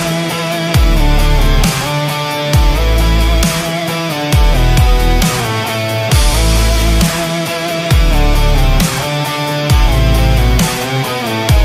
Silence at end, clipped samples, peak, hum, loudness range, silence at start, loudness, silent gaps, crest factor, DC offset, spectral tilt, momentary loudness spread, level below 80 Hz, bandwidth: 0 s; under 0.1%; 0 dBFS; none; 1 LU; 0 s; -13 LUFS; none; 10 dB; under 0.1%; -4.5 dB/octave; 4 LU; -14 dBFS; 16 kHz